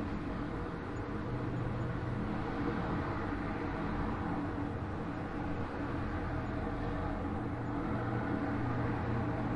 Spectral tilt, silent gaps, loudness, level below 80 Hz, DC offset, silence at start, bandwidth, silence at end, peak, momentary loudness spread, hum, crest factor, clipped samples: -8.5 dB/octave; none; -37 LUFS; -46 dBFS; under 0.1%; 0 s; 10.5 kHz; 0 s; -24 dBFS; 4 LU; none; 12 dB; under 0.1%